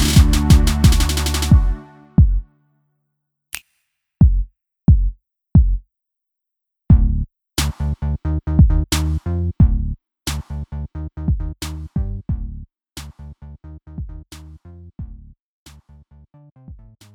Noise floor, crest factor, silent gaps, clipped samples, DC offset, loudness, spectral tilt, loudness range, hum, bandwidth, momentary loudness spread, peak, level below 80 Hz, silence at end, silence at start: -81 dBFS; 18 dB; 15.40-15.66 s, 16.52-16.56 s; under 0.1%; under 0.1%; -18 LUFS; -5.5 dB/octave; 19 LU; none; 18 kHz; 22 LU; 0 dBFS; -22 dBFS; 0.4 s; 0 s